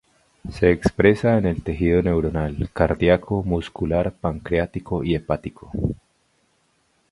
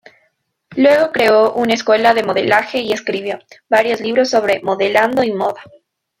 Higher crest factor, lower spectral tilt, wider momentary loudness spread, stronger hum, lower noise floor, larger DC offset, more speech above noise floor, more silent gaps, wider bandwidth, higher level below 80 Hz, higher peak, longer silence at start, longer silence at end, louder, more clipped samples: first, 22 dB vs 16 dB; first, -8 dB/octave vs -4 dB/octave; about the same, 10 LU vs 10 LU; neither; about the same, -65 dBFS vs -64 dBFS; neither; second, 44 dB vs 49 dB; neither; second, 11.5 kHz vs 16 kHz; first, -36 dBFS vs -58 dBFS; about the same, 0 dBFS vs 0 dBFS; second, 0.45 s vs 0.7 s; first, 1.15 s vs 0.5 s; second, -22 LUFS vs -15 LUFS; neither